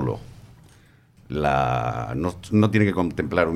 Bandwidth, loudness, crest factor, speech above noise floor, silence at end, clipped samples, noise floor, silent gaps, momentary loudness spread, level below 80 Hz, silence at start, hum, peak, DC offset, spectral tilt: 12.5 kHz; -23 LUFS; 18 dB; 32 dB; 0 s; under 0.1%; -54 dBFS; none; 9 LU; -44 dBFS; 0 s; none; -6 dBFS; under 0.1%; -7.5 dB/octave